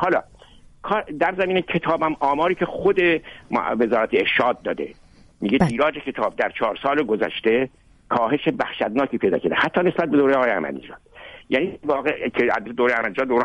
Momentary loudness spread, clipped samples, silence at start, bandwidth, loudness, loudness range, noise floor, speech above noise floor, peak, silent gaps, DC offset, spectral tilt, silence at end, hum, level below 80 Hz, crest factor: 8 LU; under 0.1%; 0 s; 11 kHz; -21 LUFS; 2 LU; -48 dBFS; 27 dB; -4 dBFS; none; under 0.1%; -7 dB/octave; 0 s; none; -52 dBFS; 18 dB